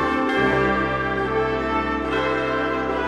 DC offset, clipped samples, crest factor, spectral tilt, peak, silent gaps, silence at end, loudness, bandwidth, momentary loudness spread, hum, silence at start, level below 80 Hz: under 0.1%; under 0.1%; 14 dB; -6.5 dB/octave; -8 dBFS; none; 0 s; -21 LUFS; 11.5 kHz; 4 LU; none; 0 s; -38 dBFS